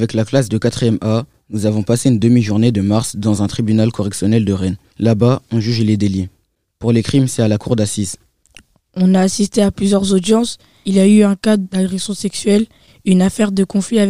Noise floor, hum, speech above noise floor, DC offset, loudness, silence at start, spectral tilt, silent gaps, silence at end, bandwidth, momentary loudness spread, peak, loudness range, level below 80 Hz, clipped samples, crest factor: -47 dBFS; none; 33 dB; 0.8%; -15 LUFS; 0 s; -6 dB/octave; none; 0 s; 15 kHz; 8 LU; 0 dBFS; 3 LU; -46 dBFS; under 0.1%; 14 dB